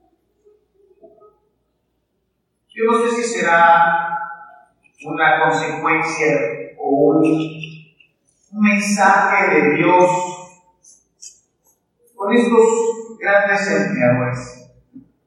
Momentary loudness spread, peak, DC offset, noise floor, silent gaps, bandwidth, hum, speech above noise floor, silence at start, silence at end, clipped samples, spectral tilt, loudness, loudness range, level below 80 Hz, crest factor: 16 LU; 0 dBFS; under 0.1%; -70 dBFS; none; 12.5 kHz; none; 55 dB; 2.75 s; 0.25 s; under 0.1%; -5 dB/octave; -16 LUFS; 3 LU; -62 dBFS; 18 dB